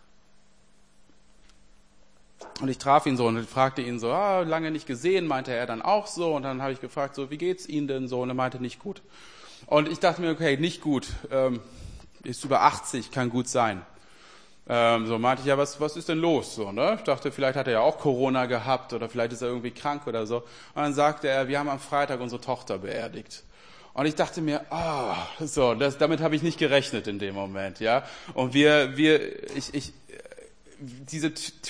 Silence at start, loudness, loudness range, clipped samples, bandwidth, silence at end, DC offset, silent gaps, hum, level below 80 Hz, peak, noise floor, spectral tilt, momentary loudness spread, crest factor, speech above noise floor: 2.4 s; -26 LUFS; 5 LU; under 0.1%; 10.5 kHz; 0 s; 0.2%; none; none; -56 dBFS; -4 dBFS; -62 dBFS; -5 dB/octave; 13 LU; 22 dB; 35 dB